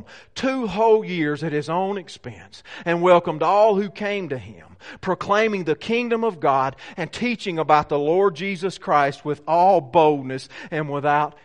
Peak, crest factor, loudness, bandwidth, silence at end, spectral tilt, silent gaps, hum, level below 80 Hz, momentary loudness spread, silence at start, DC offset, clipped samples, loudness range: -2 dBFS; 18 dB; -21 LUFS; 10.5 kHz; 0.15 s; -6 dB/octave; none; none; -58 dBFS; 14 LU; 0.1 s; 0.2%; under 0.1%; 3 LU